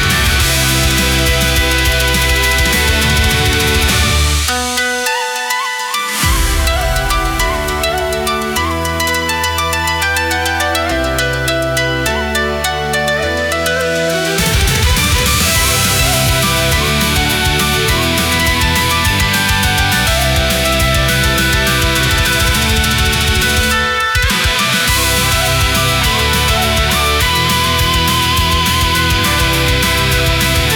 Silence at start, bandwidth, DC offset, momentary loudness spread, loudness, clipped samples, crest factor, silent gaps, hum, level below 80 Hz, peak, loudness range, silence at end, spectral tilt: 0 s; over 20 kHz; under 0.1%; 4 LU; -12 LUFS; under 0.1%; 12 dB; none; none; -20 dBFS; 0 dBFS; 3 LU; 0 s; -3 dB/octave